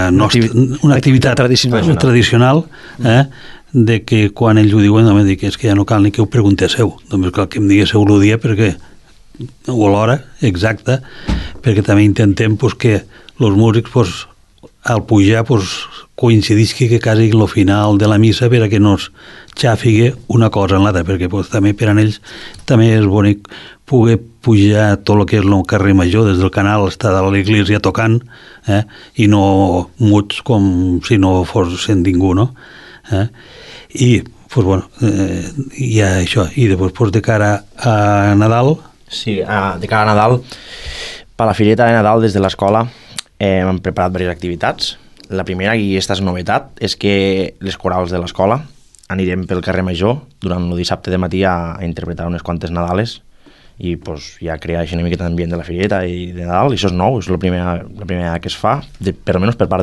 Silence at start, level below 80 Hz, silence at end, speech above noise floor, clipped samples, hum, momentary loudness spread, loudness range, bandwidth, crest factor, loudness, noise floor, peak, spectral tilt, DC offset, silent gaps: 0 s; -32 dBFS; 0 s; 31 dB; under 0.1%; none; 11 LU; 6 LU; 12 kHz; 12 dB; -13 LUFS; -44 dBFS; 0 dBFS; -6.5 dB/octave; under 0.1%; none